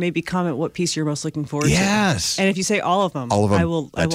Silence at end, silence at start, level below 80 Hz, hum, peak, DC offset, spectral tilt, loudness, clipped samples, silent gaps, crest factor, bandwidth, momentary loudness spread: 0 s; 0 s; -44 dBFS; none; -6 dBFS; under 0.1%; -4.5 dB/octave; -20 LUFS; under 0.1%; none; 14 dB; 16 kHz; 6 LU